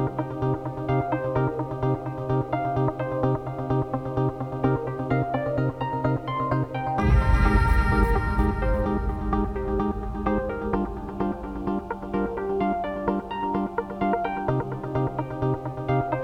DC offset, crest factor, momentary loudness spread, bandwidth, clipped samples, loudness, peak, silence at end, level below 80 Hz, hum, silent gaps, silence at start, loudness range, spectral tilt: under 0.1%; 18 dB; 7 LU; 11 kHz; under 0.1%; -26 LUFS; -6 dBFS; 0 s; -30 dBFS; none; none; 0 s; 4 LU; -9 dB/octave